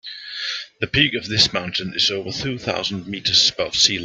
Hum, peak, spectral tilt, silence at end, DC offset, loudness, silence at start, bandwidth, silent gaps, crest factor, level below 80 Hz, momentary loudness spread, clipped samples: none; 0 dBFS; -2.5 dB/octave; 0 s; under 0.1%; -19 LUFS; 0.05 s; 13 kHz; none; 22 dB; -50 dBFS; 11 LU; under 0.1%